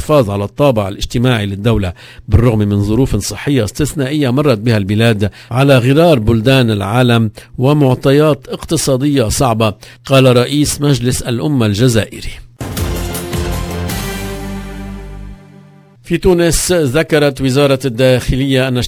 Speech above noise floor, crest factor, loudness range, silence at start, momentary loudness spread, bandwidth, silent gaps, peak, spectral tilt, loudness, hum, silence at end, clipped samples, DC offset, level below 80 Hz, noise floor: 29 dB; 12 dB; 7 LU; 0 s; 12 LU; 16 kHz; none; 0 dBFS; -5.5 dB/octave; -13 LUFS; none; 0 s; 0.1%; under 0.1%; -28 dBFS; -41 dBFS